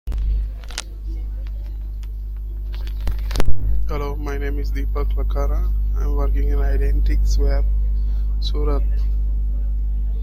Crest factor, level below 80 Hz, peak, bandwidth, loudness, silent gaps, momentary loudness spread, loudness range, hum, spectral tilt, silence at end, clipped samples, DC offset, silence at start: 18 dB; -20 dBFS; 0 dBFS; 12.5 kHz; -24 LUFS; none; 10 LU; 7 LU; 50 Hz at -20 dBFS; -6.5 dB/octave; 0 s; under 0.1%; under 0.1%; 0.05 s